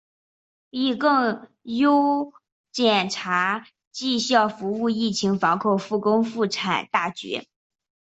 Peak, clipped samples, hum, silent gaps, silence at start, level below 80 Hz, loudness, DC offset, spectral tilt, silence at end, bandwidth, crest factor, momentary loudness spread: -4 dBFS; under 0.1%; none; 2.52-2.64 s, 3.87-3.91 s; 0.75 s; -68 dBFS; -23 LUFS; under 0.1%; -4.5 dB/octave; 0.75 s; 8.2 kHz; 20 dB; 11 LU